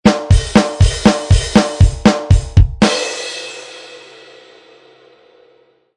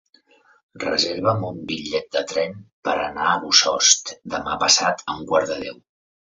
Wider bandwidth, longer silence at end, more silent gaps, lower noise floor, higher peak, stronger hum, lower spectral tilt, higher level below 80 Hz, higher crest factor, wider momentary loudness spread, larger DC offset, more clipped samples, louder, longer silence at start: first, 11 kHz vs 7.8 kHz; first, 2 s vs 0.55 s; second, none vs 2.72-2.83 s; second, -53 dBFS vs -57 dBFS; about the same, 0 dBFS vs 0 dBFS; neither; first, -5.5 dB/octave vs -1.5 dB/octave; first, -20 dBFS vs -56 dBFS; second, 14 dB vs 22 dB; first, 17 LU vs 13 LU; neither; first, 0.7% vs under 0.1%; first, -13 LUFS vs -20 LUFS; second, 0.05 s vs 0.75 s